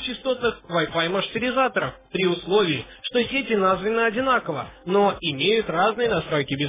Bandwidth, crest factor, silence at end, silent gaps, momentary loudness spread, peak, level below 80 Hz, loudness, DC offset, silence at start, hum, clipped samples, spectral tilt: 3.9 kHz; 14 dB; 0 s; none; 5 LU; -8 dBFS; -52 dBFS; -23 LUFS; under 0.1%; 0 s; none; under 0.1%; -9 dB/octave